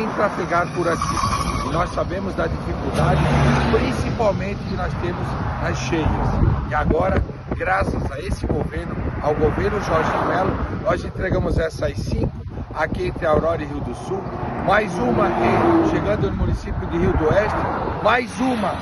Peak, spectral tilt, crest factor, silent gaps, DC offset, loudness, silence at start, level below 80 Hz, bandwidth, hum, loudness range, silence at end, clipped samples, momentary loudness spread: -4 dBFS; -6.5 dB/octave; 18 dB; none; under 0.1%; -21 LUFS; 0 s; -30 dBFS; 12 kHz; none; 3 LU; 0 s; under 0.1%; 8 LU